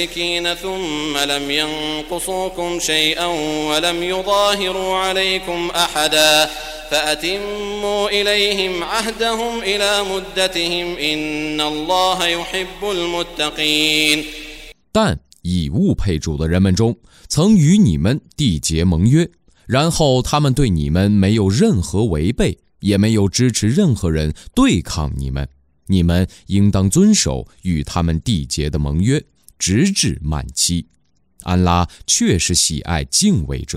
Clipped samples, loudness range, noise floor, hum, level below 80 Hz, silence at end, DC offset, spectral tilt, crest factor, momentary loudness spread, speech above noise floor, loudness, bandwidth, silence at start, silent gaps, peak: under 0.1%; 3 LU; -47 dBFS; none; -32 dBFS; 0 s; under 0.1%; -4.5 dB/octave; 18 dB; 8 LU; 31 dB; -17 LUFS; 16 kHz; 0 s; none; 0 dBFS